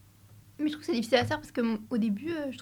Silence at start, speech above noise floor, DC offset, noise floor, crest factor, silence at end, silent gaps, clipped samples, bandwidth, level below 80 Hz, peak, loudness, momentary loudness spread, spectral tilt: 0.3 s; 26 dB; under 0.1%; -55 dBFS; 20 dB; 0 s; none; under 0.1%; 19.5 kHz; -64 dBFS; -10 dBFS; -30 LUFS; 7 LU; -5.5 dB/octave